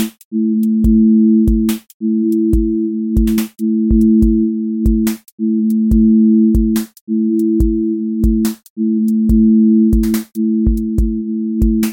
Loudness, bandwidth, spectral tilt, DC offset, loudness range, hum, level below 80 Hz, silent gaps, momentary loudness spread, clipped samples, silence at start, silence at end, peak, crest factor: -14 LUFS; 17 kHz; -8 dB/octave; under 0.1%; 1 LU; none; -22 dBFS; 0.25-0.31 s, 1.94-2.00 s, 5.32-5.38 s, 7.01-7.07 s, 8.70-8.76 s; 9 LU; under 0.1%; 0 s; 0 s; -2 dBFS; 12 dB